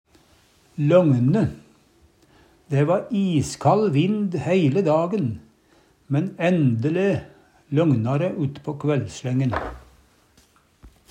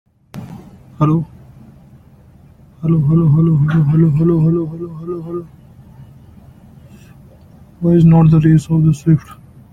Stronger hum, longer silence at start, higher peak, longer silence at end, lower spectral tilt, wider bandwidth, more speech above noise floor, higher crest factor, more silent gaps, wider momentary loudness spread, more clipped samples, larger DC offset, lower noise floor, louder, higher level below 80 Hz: neither; first, 0.75 s vs 0.35 s; about the same, -4 dBFS vs -2 dBFS; second, 0.25 s vs 0.4 s; second, -7.5 dB/octave vs -10 dB/octave; first, 11 kHz vs 7.2 kHz; first, 38 dB vs 32 dB; about the same, 18 dB vs 14 dB; neither; second, 9 LU vs 19 LU; neither; neither; first, -58 dBFS vs -44 dBFS; second, -22 LUFS vs -13 LUFS; second, -52 dBFS vs -42 dBFS